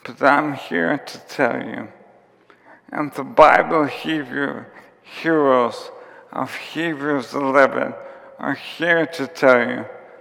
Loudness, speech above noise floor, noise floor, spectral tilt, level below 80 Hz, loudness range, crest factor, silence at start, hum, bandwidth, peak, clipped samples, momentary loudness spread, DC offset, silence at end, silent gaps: -19 LUFS; 34 dB; -53 dBFS; -5.5 dB/octave; -60 dBFS; 4 LU; 20 dB; 0.05 s; none; 16 kHz; 0 dBFS; under 0.1%; 17 LU; under 0.1%; 0.15 s; none